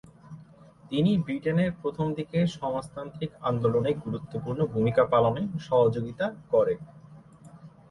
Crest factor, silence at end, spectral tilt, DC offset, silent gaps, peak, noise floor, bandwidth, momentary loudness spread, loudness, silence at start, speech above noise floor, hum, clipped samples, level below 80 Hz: 18 dB; 0.2 s; -8 dB/octave; under 0.1%; none; -10 dBFS; -52 dBFS; 11.5 kHz; 12 LU; -27 LUFS; 0.25 s; 26 dB; none; under 0.1%; -58 dBFS